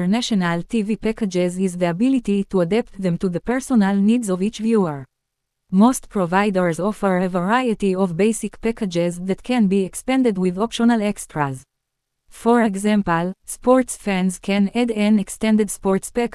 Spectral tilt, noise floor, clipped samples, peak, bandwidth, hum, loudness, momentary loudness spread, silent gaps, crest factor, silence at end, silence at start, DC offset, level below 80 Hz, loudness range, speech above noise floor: -6 dB/octave; -77 dBFS; under 0.1%; -2 dBFS; 12 kHz; none; -20 LUFS; 6 LU; none; 16 dB; 0 s; 0 s; under 0.1%; -48 dBFS; 2 LU; 58 dB